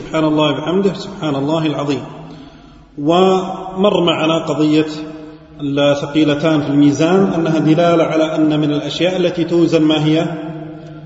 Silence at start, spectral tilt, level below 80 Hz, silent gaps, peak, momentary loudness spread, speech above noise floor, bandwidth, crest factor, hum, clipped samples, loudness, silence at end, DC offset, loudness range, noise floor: 0 s; -6.5 dB/octave; -50 dBFS; none; 0 dBFS; 13 LU; 26 dB; 8 kHz; 14 dB; none; under 0.1%; -15 LUFS; 0 s; under 0.1%; 4 LU; -40 dBFS